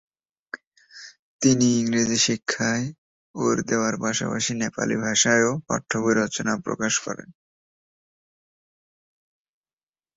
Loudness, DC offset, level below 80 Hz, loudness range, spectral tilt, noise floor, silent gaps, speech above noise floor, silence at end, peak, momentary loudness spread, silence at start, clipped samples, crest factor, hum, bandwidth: -22 LUFS; under 0.1%; -62 dBFS; 8 LU; -3.5 dB/octave; under -90 dBFS; 0.67-0.71 s, 1.19-1.39 s, 2.98-3.34 s; over 67 dB; 2.85 s; -4 dBFS; 21 LU; 0.55 s; under 0.1%; 20 dB; none; 8 kHz